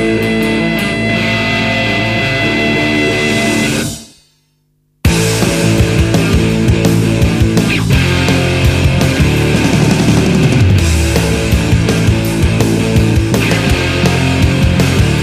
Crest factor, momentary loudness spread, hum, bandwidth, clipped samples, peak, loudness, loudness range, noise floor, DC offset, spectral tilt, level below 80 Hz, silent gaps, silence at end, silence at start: 12 dB; 2 LU; none; 15.5 kHz; under 0.1%; 0 dBFS; -12 LUFS; 3 LU; -58 dBFS; under 0.1%; -5.5 dB/octave; -22 dBFS; none; 0 s; 0 s